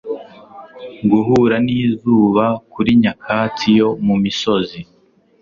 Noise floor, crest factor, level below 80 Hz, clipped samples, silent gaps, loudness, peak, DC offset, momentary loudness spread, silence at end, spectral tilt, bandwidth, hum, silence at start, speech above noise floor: -39 dBFS; 14 dB; -50 dBFS; under 0.1%; none; -15 LUFS; -2 dBFS; under 0.1%; 14 LU; 0.6 s; -7 dB/octave; 7.2 kHz; none; 0.05 s; 24 dB